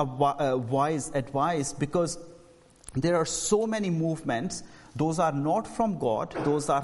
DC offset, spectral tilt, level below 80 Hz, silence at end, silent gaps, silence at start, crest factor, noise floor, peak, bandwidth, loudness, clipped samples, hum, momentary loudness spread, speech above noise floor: under 0.1%; -5.5 dB/octave; -56 dBFS; 0 s; none; 0 s; 18 dB; -55 dBFS; -10 dBFS; 11.5 kHz; -28 LUFS; under 0.1%; none; 6 LU; 28 dB